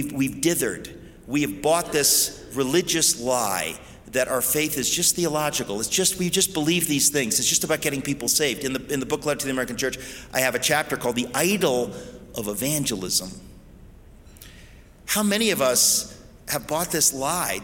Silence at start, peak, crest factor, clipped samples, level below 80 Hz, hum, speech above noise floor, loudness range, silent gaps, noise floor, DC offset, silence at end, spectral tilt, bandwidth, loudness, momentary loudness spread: 0 s; -6 dBFS; 18 dB; under 0.1%; -50 dBFS; none; 23 dB; 5 LU; none; -47 dBFS; under 0.1%; 0 s; -2.5 dB/octave; 17 kHz; -22 LUFS; 10 LU